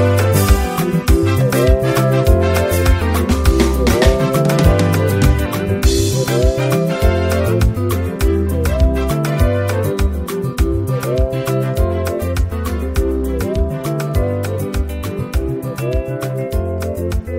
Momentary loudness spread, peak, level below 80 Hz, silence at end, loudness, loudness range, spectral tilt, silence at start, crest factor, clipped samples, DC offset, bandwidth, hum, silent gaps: 7 LU; 0 dBFS; -20 dBFS; 0 s; -16 LUFS; 6 LU; -6 dB/octave; 0 s; 14 dB; under 0.1%; 0.2%; 16.5 kHz; none; none